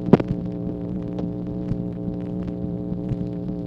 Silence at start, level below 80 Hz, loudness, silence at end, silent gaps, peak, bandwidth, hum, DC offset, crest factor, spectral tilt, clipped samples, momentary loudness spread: 0 s; -42 dBFS; -27 LUFS; 0 s; none; 0 dBFS; 5.8 kHz; none; under 0.1%; 24 dB; -10.5 dB/octave; under 0.1%; 5 LU